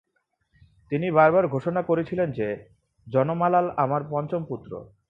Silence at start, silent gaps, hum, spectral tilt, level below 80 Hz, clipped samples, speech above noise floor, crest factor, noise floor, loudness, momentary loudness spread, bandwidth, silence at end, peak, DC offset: 0.9 s; none; none; -10 dB/octave; -62 dBFS; under 0.1%; 50 dB; 20 dB; -74 dBFS; -24 LUFS; 13 LU; 5.2 kHz; 0.25 s; -4 dBFS; under 0.1%